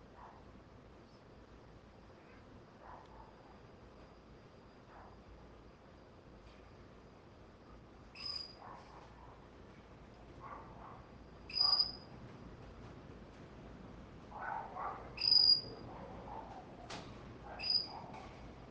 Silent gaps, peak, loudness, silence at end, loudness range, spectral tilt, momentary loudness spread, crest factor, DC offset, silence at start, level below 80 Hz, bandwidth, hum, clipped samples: none; -18 dBFS; -34 LUFS; 0 s; 25 LU; -4 dB/octave; 27 LU; 26 dB; under 0.1%; 0 s; -62 dBFS; 9 kHz; none; under 0.1%